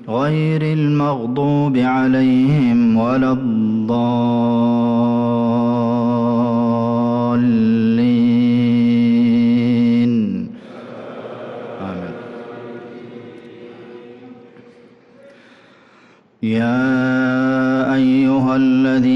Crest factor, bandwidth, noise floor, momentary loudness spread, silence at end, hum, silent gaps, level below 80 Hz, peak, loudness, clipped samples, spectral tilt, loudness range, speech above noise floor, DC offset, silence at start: 8 dB; 6 kHz; -50 dBFS; 18 LU; 0 s; none; none; -54 dBFS; -8 dBFS; -16 LUFS; under 0.1%; -9 dB/octave; 17 LU; 35 dB; under 0.1%; 0 s